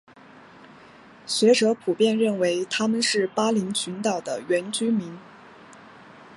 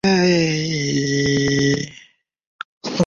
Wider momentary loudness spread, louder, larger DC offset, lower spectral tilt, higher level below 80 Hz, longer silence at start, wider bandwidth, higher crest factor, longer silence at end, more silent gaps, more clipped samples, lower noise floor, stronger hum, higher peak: second, 9 LU vs 16 LU; second, -23 LUFS vs -18 LUFS; neither; about the same, -4 dB/octave vs -5 dB/octave; second, -72 dBFS vs -48 dBFS; first, 0.35 s vs 0.05 s; first, 11.5 kHz vs 7.6 kHz; about the same, 18 dB vs 16 dB; about the same, 0 s vs 0 s; second, none vs 2.47-2.59 s, 2.65-2.81 s; neither; second, -49 dBFS vs -53 dBFS; neither; about the same, -6 dBFS vs -4 dBFS